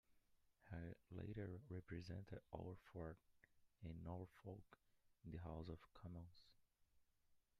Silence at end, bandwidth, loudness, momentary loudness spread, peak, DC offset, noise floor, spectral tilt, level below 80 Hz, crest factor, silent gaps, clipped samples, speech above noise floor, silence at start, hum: 0.2 s; 11.5 kHz; -57 LUFS; 6 LU; -36 dBFS; under 0.1%; -80 dBFS; -8.5 dB/octave; -72 dBFS; 20 dB; none; under 0.1%; 25 dB; 0.1 s; none